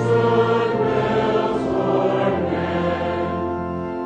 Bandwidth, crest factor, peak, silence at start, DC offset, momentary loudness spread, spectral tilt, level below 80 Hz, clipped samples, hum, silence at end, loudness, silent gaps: 9 kHz; 14 dB; -6 dBFS; 0 s; under 0.1%; 7 LU; -7.5 dB/octave; -46 dBFS; under 0.1%; none; 0 s; -20 LUFS; none